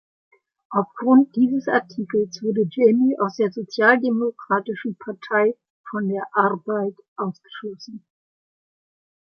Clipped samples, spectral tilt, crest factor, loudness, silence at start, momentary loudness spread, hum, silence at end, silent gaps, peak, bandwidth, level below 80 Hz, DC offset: under 0.1%; -7 dB/octave; 20 dB; -21 LUFS; 0.7 s; 16 LU; none; 1.25 s; 5.70-5.84 s, 7.08-7.16 s; -2 dBFS; 6.6 kHz; -74 dBFS; under 0.1%